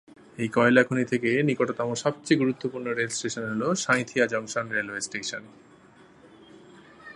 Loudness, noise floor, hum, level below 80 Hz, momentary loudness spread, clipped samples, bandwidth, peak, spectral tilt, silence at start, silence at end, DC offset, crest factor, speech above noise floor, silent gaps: -26 LUFS; -54 dBFS; none; -68 dBFS; 10 LU; under 0.1%; 11.5 kHz; -4 dBFS; -4.5 dB/octave; 0.35 s; 0 s; under 0.1%; 22 dB; 28 dB; none